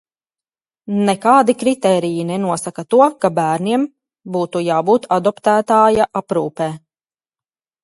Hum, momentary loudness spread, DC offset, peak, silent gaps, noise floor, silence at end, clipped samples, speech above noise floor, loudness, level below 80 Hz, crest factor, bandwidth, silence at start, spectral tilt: none; 11 LU; under 0.1%; 0 dBFS; none; under -90 dBFS; 1.05 s; under 0.1%; over 75 dB; -16 LUFS; -56 dBFS; 16 dB; 11.5 kHz; 0.9 s; -6 dB/octave